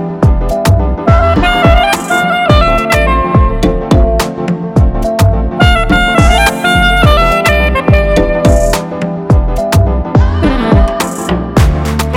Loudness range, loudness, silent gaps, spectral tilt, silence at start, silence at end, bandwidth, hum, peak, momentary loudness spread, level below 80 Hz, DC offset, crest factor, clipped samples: 2 LU; -10 LUFS; none; -6 dB/octave; 0 s; 0 s; 17 kHz; none; 0 dBFS; 6 LU; -14 dBFS; under 0.1%; 8 dB; 0.4%